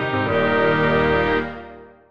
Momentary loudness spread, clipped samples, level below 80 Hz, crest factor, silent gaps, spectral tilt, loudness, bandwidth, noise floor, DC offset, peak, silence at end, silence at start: 10 LU; under 0.1%; -42 dBFS; 14 dB; none; -7.5 dB/octave; -19 LUFS; 6.8 kHz; -41 dBFS; under 0.1%; -6 dBFS; 0 s; 0 s